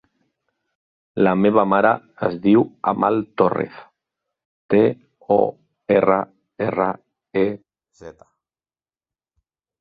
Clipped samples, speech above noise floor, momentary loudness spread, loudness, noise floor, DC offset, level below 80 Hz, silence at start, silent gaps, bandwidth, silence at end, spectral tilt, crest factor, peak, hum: under 0.1%; over 72 dB; 14 LU; -19 LUFS; under -90 dBFS; under 0.1%; -60 dBFS; 1.15 s; 4.45-4.69 s; 5 kHz; 1.7 s; -9.5 dB/octave; 20 dB; -2 dBFS; none